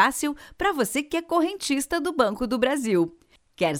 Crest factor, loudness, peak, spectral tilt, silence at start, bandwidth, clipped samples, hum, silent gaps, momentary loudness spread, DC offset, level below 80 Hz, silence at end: 18 dB; -25 LUFS; -6 dBFS; -4 dB/octave; 0 s; 20 kHz; under 0.1%; none; none; 4 LU; under 0.1%; -52 dBFS; 0 s